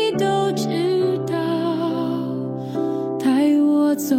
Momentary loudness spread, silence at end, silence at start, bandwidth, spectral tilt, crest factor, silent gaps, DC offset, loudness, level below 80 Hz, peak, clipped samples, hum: 8 LU; 0 s; 0 s; 16.5 kHz; -6 dB/octave; 12 dB; none; under 0.1%; -20 LUFS; -64 dBFS; -8 dBFS; under 0.1%; none